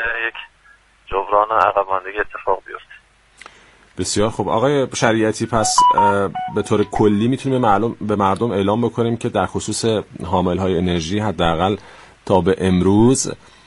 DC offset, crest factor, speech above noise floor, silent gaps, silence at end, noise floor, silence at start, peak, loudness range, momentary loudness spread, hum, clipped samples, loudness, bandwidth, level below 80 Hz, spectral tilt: under 0.1%; 18 dB; 34 dB; none; 0.3 s; -51 dBFS; 0 s; 0 dBFS; 5 LU; 10 LU; none; under 0.1%; -18 LUFS; 11.5 kHz; -42 dBFS; -5 dB/octave